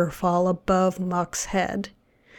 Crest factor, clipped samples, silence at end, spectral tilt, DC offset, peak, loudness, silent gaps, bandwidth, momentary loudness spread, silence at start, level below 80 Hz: 14 dB; under 0.1%; 0.5 s; -5.5 dB/octave; under 0.1%; -10 dBFS; -24 LUFS; none; 18 kHz; 7 LU; 0 s; -48 dBFS